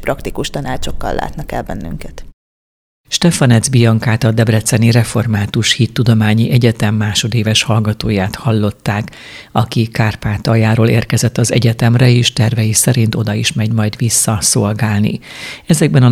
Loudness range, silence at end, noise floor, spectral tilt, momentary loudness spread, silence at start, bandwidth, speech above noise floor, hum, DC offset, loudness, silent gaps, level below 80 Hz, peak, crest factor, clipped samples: 4 LU; 0 s; under -90 dBFS; -5 dB/octave; 11 LU; 0 s; 15 kHz; over 77 dB; none; under 0.1%; -13 LUFS; 2.34-3.04 s; -34 dBFS; 0 dBFS; 12 dB; under 0.1%